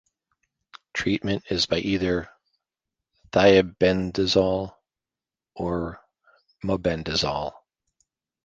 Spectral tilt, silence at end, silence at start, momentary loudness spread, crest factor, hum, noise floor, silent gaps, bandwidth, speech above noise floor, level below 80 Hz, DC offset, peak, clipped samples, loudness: -5 dB/octave; 0.95 s; 0.75 s; 14 LU; 22 dB; none; under -90 dBFS; none; 9.2 kHz; over 67 dB; -48 dBFS; under 0.1%; -4 dBFS; under 0.1%; -24 LUFS